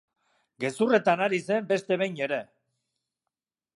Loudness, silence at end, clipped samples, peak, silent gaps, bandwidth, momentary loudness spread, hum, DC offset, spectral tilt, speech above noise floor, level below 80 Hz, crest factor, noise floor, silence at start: -26 LUFS; 1.35 s; under 0.1%; -10 dBFS; none; 11.5 kHz; 11 LU; none; under 0.1%; -5.5 dB/octave; 62 dB; -82 dBFS; 20 dB; -88 dBFS; 0.6 s